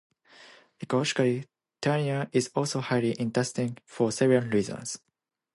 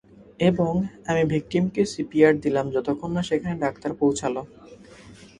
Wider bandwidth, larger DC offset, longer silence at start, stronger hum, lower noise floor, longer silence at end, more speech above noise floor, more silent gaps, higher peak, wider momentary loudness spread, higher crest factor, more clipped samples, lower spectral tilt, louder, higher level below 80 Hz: about the same, 11.5 kHz vs 11 kHz; neither; first, 0.4 s vs 0.2 s; neither; first, -54 dBFS vs -47 dBFS; first, 0.6 s vs 0.25 s; about the same, 27 dB vs 24 dB; neither; second, -10 dBFS vs -4 dBFS; about the same, 10 LU vs 9 LU; about the same, 18 dB vs 20 dB; neither; about the same, -5.5 dB/octave vs -6.5 dB/octave; second, -28 LUFS vs -24 LUFS; second, -68 dBFS vs -52 dBFS